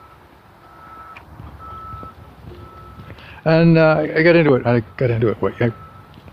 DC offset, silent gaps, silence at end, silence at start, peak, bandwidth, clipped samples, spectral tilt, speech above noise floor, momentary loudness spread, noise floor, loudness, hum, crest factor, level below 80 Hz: under 0.1%; none; 0.45 s; 0.9 s; 0 dBFS; 5.4 kHz; under 0.1%; -9.5 dB/octave; 32 dB; 26 LU; -46 dBFS; -16 LUFS; none; 18 dB; -46 dBFS